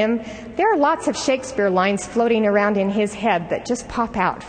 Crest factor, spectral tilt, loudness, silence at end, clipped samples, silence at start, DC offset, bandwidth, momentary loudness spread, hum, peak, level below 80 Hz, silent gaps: 14 dB; -5 dB/octave; -20 LUFS; 0 s; under 0.1%; 0 s; under 0.1%; 9.4 kHz; 7 LU; none; -4 dBFS; -48 dBFS; none